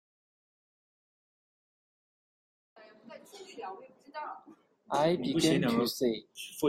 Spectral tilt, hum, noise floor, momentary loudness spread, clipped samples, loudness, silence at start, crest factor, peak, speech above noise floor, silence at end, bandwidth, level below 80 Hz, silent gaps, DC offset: -5 dB/octave; none; -52 dBFS; 23 LU; under 0.1%; -30 LUFS; 2.8 s; 20 dB; -14 dBFS; 21 dB; 0 s; 16 kHz; -70 dBFS; none; under 0.1%